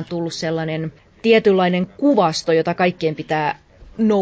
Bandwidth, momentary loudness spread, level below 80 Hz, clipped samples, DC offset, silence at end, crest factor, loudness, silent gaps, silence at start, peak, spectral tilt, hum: 8 kHz; 11 LU; -54 dBFS; under 0.1%; under 0.1%; 0 s; 16 dB; -19 LUFS; none; 0 s; -2 dBFS; -6 dB/octave; none